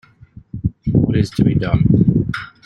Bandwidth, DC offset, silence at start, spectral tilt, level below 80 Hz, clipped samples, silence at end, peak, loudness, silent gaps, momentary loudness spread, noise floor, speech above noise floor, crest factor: 11 kHz; under 0.1%; 0.55 s; -8.5 dB/octave; -34 dBFS; under 0.1%; 0.2 s; -2 dBFS; -17 LUFS; none; 12 LU; -43 dBFS; 28 dB; 16 dB